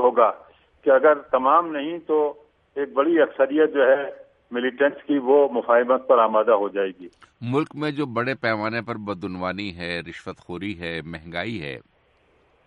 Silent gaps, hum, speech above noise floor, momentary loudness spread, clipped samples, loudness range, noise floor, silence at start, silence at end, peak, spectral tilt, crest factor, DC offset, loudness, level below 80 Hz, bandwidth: none; none; 40 dB; 14 LU; under 0.1%; 10 LU; -61 dBFS; 0 s; 0.85 s; -4 dBFS; -7.5 dB/octave; 18 dB; under 0.1%; -22 LUFS; -60 dBFS; 8.8 kHz